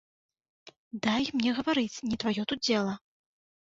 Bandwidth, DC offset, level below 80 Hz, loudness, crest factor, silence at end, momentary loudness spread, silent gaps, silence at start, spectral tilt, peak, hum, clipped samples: 7.8 kHz; under 0.1%; -64 dBFS; -29 LUFS; 22 dB; 0.8 s; 7 LU; 0.77-0.91 s; 0.65 s; -4.5 dB/octave; -10 dBFS; none; under 0.1%